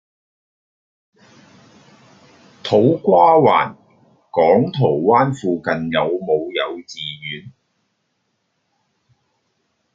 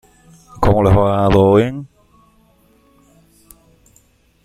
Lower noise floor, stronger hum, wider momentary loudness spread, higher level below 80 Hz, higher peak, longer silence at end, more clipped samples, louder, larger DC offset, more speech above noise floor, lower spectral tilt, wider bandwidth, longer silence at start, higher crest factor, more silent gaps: first, -70 dBFS vs -54 dBFS; neither; first, 16 LU vs 10 LU; second, -62 dBFS vs -34 dBFS; about the same, -2 dBFS vs -2 dBFS; second, 2.45 s vs 2.6 s; neither; second, -17 LUFS vs -14 LUFS; neither; first, 54 dB vs 42 dB; second, -7 dB/octave vs -8.5 dB/octave; second, 7.8 kHz vs 13.5 kHz; first, 2.65 s vs 0.6 s; about the same, 18 dB vs 16 dB; neither